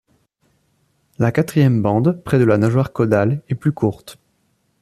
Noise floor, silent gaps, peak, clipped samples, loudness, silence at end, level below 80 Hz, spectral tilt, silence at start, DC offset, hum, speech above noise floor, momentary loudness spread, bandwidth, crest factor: -65 dBFS; none; -2 dBFS; under 0.1%; -17 LUFS; 0.7 s; -52 dBFS; -8.5 dB/octave; 1.2 s; under 0.1%; none; 48 dB; 7 LU; 14.5 kHz; 16 dB